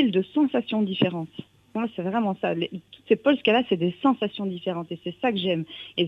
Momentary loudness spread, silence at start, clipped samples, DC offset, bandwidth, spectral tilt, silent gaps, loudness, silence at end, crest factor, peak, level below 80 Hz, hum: 12 LU; 0 s; under 0.1%; under 0.1%; 5.6 kHz; -8 dB/octave; none; -25 LUFS; 0 s; 18 dB; -6 dBFS; -68 dBFS; none